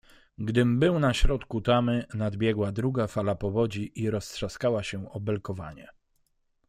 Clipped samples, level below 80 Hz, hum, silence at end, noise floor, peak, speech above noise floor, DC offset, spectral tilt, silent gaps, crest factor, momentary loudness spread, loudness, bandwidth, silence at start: under 0.1%; -36 dBFS; none; 0.8 s; -71 dBFS; -8 dBFS; 44 dB; under 0.1%; -6.5 dB/octave; none; 20 dB; 11 LU; -28 LUFS; 14.5 kHz; 0.4 s